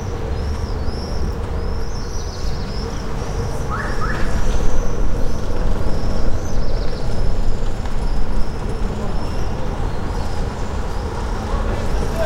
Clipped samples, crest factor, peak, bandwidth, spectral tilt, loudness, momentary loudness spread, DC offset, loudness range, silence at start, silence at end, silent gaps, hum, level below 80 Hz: under 0.1%; 14 dB; -2 dBFS; 9 kHz; -6 dB/octave; -25 LUFS; 3 LU; under 0.1%; 2 LU; 0 s; 0 s; none; none; -20 dBFS